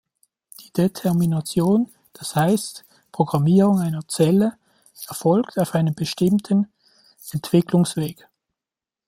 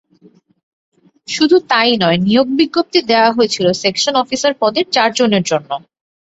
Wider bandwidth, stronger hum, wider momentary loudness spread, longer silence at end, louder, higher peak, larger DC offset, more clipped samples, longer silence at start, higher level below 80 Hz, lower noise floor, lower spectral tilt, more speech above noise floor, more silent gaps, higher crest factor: first, 16.5 kHz vs 8 kHz; neither; first, 14 LU vs 6 LU; first, 0.95 s vs 0.6 s; second, -21 LUFS vs -13 LUFS; about the same, -2 dBFS vs 0 dBFS; neither; neither; second, 0.6 s vs 1.3 s; about the same, -60 dBFS vs -56 dBFS; first, -89 dBFS vs -49 dBFS; first, -6.5 dB/octave vs -4 dB/octave; first, 70 dB vs 35 dB; neither; about the same, 18 dB vs 14 dB